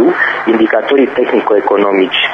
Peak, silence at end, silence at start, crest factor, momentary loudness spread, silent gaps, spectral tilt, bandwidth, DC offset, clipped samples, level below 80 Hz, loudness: 0 dBFS; 0 s; 0 s; 10 dB; 1 LU; none; -6 dB/octave; 6.2 kHz; under 0.1%; under 0.1%; -58 dBFS; -11 LUFS